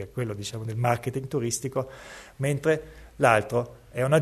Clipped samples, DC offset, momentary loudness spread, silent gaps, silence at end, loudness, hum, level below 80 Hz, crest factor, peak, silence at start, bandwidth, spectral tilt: under 0.1%; under 0.1%; 15 LU; none; 0 s; -27 LUFS; none; -54 dBFS; 22 dB; -4 dBFS; 0 s; 13.5 kHz; -5.5 dB/octave